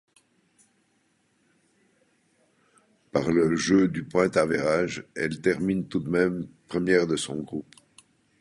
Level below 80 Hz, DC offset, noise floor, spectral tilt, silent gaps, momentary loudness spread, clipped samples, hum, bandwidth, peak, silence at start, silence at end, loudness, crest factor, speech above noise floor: -58 dBFS; under 0.1%; -69 dBFS; -5.5 dB/octave; none; 10 LU; under 0.1%; none; 11.5 kHz; -6 dBFS; 3.15 s; 0.8 s; -25 LUFS; 20 dB; 44 dB